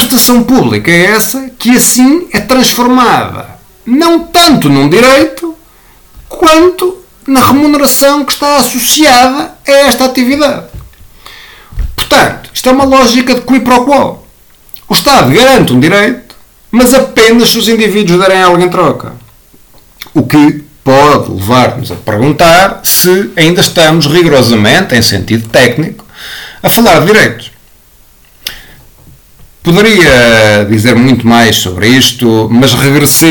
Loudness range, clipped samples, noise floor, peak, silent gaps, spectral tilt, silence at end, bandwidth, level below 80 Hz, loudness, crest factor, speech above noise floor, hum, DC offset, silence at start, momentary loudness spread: 4 LU; 0.8%; -40 dBFS; 0 dBFS; none; -4 dB/octave; 0 s; 19.5 kHz; -32 dBFS; -6 LUFS; 6 dB; 35 dB; none; under 0.1%; 0 s; 11 LU